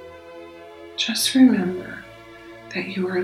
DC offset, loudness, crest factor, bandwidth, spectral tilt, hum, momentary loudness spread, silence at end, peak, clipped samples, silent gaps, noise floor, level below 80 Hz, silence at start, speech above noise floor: under 0.1%; -20 LUFS; 18 dB; 13.5 kHz; -4 dB/octave; none; 26 LU; 0 s; -4 dBFS; under 0.1%; none; -42 dBFS; -60 dBFS; 0 s; 23 dB